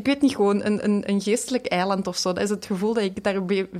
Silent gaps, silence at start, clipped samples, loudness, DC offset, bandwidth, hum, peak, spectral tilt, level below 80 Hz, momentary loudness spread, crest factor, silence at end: none; 0 s; under 0.1%; -23 LUFS; under 0.1%; 14.5 kHz; none; -10 dBFS; -5 dB/octave; -58 dBFS; 4 LU; 14 dB; 0 s